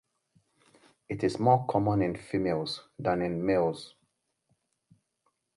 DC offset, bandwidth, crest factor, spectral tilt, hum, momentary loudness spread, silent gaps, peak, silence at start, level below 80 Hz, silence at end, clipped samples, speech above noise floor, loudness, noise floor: under 0.1%; 11.5 kHz; 22 dB; -7 dB/octave; none; 12 LU; none; -8 dBFS; 1.1 s; -58 dBFS; 1.7 s; under 0.1%; 49 dB; -29 LUFS; -77 dBFS